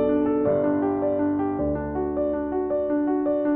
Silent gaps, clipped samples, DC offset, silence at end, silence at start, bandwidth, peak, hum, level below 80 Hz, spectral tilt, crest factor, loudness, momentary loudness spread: none; under 0.1%; under 0.1%; 0 s; 0 s; 3.6 kHz; -12 dBFS; none; -44 dBFS; -8.5 dB/octave; 12 dB; -24 LUFS; 4 LU